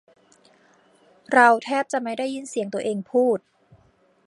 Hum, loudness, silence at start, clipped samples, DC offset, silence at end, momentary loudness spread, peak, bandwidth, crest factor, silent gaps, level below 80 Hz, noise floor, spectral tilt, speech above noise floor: none; -22 LUFS; 1.3 s; under 0.1%; under 0.1%; 0.9 s; 12 LU; -2 dBFS; 11.5 kHz; 22 dB; none; -74 dBFS; -60 dBFS; -4.5 dB/octave; 39 dB